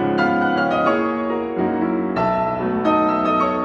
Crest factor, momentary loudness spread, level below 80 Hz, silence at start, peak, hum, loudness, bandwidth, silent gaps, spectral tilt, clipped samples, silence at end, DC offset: 14 dB; 4 LU; -50 dBFS; 0 s; -6 dBFS; none; -19 LUFS; 7.4 kHz; none; -7.5 dB/octave; under 0.1%; 0 s; under 0.1%